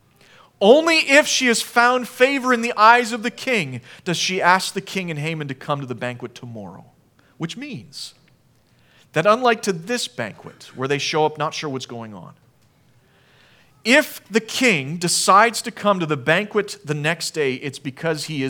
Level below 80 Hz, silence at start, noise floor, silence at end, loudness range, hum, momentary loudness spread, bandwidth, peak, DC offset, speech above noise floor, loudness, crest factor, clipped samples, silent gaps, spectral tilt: -70 dBFS; 0.6 s; -57 dBFS; 0 s; 12 LU; none; 19 LU; 19.5 kHz; 0 dBFS; under 0.1%; 38 dB; -19 LUFS; 20 dB; under 0.1%; none; -3.5 dB/octave